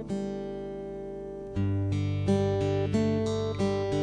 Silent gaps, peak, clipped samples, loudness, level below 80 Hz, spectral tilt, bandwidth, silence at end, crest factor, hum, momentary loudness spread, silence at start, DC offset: none; -14 dBFS; under 0.1%; -30 LUFS; -50 dBFS; -7.5 dB/octave; 9.8 kHz; 0 s; 14 dB; 50 Hz at -45 dBFS; 11 LU; 0 s; under 0.1%